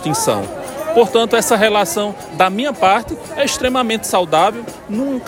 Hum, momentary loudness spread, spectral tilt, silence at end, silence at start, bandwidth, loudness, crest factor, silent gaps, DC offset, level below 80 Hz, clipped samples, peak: none; 11 LU; -3.5 dB/octave; 0 s; 0 s; 16.5 kHz; -16 LUFS; 16 dB; none; under 0.1%; -48 dBFS; under 0.1%; 0 dBFS